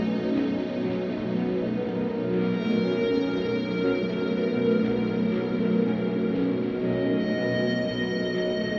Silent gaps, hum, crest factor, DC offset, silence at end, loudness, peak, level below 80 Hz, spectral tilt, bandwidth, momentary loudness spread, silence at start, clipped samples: none; none; 14 dB; under 0.1%; 0 s; -26 LUFS; -12 dBFS; -56 dBFS; -8 dB/octave; 6.8 kHz; 4 LU; 0 s; under 0.1%